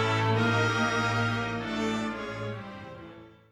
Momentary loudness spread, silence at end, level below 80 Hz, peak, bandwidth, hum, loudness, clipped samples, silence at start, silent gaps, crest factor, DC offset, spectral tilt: 18 LU; 0.2 s; -56 dBFS; -14 dBFS; 11.5 kHz; none; -28 LUFS; under 0.1%; 0 s; none; 14 dB; under 0.1%; -5.5 dB/octave